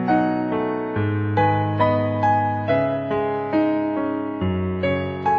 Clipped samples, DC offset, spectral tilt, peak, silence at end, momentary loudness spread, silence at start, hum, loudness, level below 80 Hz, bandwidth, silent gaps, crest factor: under 0.1%; under 0.1%; -9.5 dB/octave; -6 dBFS; 0 s; 4 LU; 0 s; none; -22 LUFS; -50 dBFS; 6.4 kHz; none; 16 dB